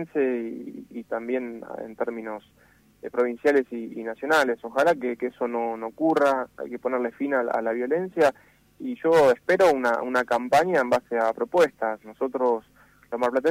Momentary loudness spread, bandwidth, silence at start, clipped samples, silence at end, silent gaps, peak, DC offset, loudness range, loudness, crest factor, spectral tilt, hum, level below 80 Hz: 15 LU; 16 kHz; 0 s; under 0.1%; 0 s; none; -10 dBFS; under 0.1%; 6 LU; -24 LUFS; 16 dB; -5 dB/octave; none; -64 dBFS